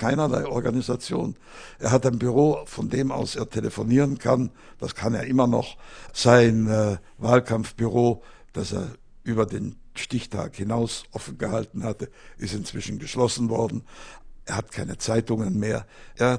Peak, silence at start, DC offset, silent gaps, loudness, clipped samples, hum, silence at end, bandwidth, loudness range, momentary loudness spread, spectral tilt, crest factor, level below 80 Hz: 0 dBFS; 0 s; under 0.1%; none; -25 LUFS; under 0.1%; none; 0 s; 10.5 kHz; 7 LU; 15 LU; -6 dB/octave; 24 dB; -48 dBFS